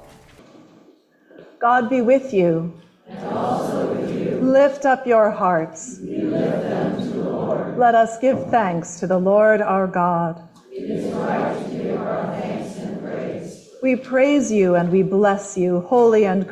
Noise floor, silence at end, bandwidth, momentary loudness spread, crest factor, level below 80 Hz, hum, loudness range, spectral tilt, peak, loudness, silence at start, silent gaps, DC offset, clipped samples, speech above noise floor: -53 dBFS; 0 s; 12 kHz; 13 LU; 16 dB; -60 dBFS; none; 6 LU; -6.5 dB/octave; -4 dBFS; -19 LUFS; 1.4 s; none; under 0.1%; under 0.1%; 35 dB